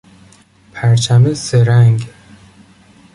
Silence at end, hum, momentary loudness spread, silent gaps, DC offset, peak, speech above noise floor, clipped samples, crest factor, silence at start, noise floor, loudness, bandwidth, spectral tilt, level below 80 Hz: 1.05 s; none; 14 LU; none; under 0.1%; -2 dBFS; 36 dB; under 0.1%; 12 dB; 0.75 s; -46 dBFS; -12 LUFS; 11.5 kHz; -6 dB/octave; -46 dBFS